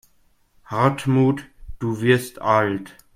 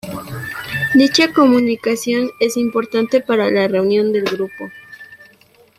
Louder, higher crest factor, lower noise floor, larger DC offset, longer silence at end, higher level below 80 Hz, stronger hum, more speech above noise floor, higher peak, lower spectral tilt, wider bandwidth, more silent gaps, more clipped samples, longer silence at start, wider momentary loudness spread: second, -21 LUFS vs -16 LUFS; about the same, 18 dB vs 16 dB; first, -59 dBFS vs -50 dBFS; neither; second, 0.25 s vs 0.65 s; first, -48 dBFS vs -56 dBFS; neither; first, 40 dB vs 35 dB; about the same, -2 dBFS vs -2 dBFS; first, -7 dB/octave vs -4.5 dB/octave; about the same, 16 kHz vs 16 kHz; neither; neither; first, 0.7 s vs 0.05 s; second, 11 LU vs 15 LU